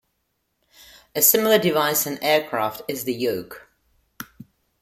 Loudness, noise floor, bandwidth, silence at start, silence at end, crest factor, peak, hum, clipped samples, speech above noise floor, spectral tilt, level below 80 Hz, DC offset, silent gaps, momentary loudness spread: -20 LUFS; -73 dBFS; 16.5 kHz; 1.15 s; 0.6 s; 22 dB; -2 dBFS; none; under 0.1%; 52 dB; -2.5 dB/octave; -64 dBFS; under 0.1%; none; 23 LU